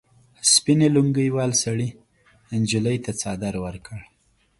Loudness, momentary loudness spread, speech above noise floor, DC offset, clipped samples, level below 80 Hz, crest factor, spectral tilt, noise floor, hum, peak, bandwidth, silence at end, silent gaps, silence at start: -21 LUFS; 16 LU; 33 dB; under 0.1%; under 0.1%; -52 dBFS; 20 dB; -4 dB/octave; -55 dBFS; none; -2 dBFS; 11.5 kHz; 0.6 s; none; 0.45 s